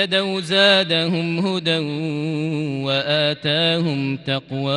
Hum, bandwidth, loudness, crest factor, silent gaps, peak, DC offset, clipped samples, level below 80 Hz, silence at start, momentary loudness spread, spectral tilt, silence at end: none; 11.5 kHz; -19 LUFS; 18 dB; none; -2 dBFS; under 0.1%; under 0.1%; -64 dBFS; 0 s; 10 LU; -5.5 dB/octave; 0 s